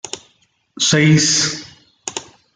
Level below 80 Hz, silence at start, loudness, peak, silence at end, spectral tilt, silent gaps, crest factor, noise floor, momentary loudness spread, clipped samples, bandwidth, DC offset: -56 dBFS; 0.05 s; -14 LUFS; -2 dBFS; 0.3 s; -3.5 dB/octave; none; 16 dB; -60 dBFS; 19 LU; under 0.1%; 9.6 kHz; under 0.1%